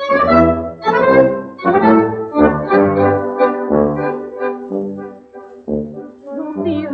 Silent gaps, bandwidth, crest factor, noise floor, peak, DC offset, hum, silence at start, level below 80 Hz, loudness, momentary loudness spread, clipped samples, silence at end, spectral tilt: none; 6.6 kHz; 14 dB; -36 dBFS; 0 dBFS; under 0.1%; none; 0 s; -42 dBFS; -15 LUFS; 15 LU; under 0.1%; 0 s; -9 dB/octave